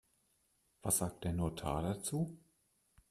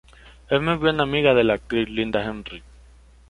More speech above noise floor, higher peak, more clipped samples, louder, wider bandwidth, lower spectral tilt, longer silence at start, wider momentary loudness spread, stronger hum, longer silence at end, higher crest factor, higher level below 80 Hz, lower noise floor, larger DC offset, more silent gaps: first, 39 dB vs 28 dB; second, -20 dBFS vs -4 dBFS; neither; second, -38 LUFS vs -21 LUFS; first, 15 kHz vs 11 kHz; second, -5 dB/octave vs -7 dB/octave; first, 0.85 s vs 0.25 s; second, 7 LU vs 16 LU; neither; about the same, 0.7 s vs 0.7 s; about the same, 20 dB vs 20 dB; second, -58 dBFS vs -46 dBFS; first, -77 dBFS vs -49 dBFS; neither; neither